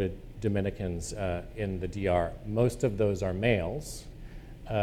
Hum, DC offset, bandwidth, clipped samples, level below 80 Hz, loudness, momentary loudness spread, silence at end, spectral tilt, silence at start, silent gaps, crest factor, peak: none; under 0.1%; 15.5 kHz; under 0.1%; -44 dBFS; -31 LUFS; 15 LU; 0 s; -6.5 dB/octave; 0 s; none; 20 dB; -12 dBFS